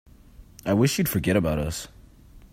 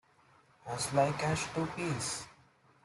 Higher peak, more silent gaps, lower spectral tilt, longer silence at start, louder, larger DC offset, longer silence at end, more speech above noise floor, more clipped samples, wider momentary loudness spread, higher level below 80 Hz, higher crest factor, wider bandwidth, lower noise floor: first, -8 dBFS vs -16 dBFS; neither; about the same, -5.5 dB/octave vs -4.5 dB/octave; second, 0.4 s vs 0.65 s; first, -24 LUFS vs -34 LUFS; neither; second, 0.15 s vs 0.5 s; second, 26 dB vs 32 dB; neither; about the same, 13 LU vs 13 LU; first, -44 dBFS vs -64 dBFS; about the same, 18 dB vs 18 dB; first, 16 kHz vs 12.5 kHz; second, -49 dBFS vs -65 dBFS